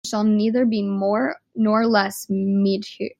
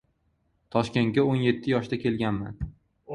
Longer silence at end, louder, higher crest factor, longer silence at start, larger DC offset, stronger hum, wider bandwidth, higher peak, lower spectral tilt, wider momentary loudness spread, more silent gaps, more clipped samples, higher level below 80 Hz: about the same, 0.1 s vs 0 s; first, -21 LUFS vs -26 LUFS; about the same, 18 dB vs 20 dB; second, 0.05 s vs 0.75 s; neither; neither; first, 16 kHz vs 11.5 kHz; first, -4 dBFS vs -8 dBFS; second, -6 dB/octave vs -7.5 dB/octave; second, 6 LU vs 12 LU; neither; neither; second, -68 dBFS vs -48 dBFS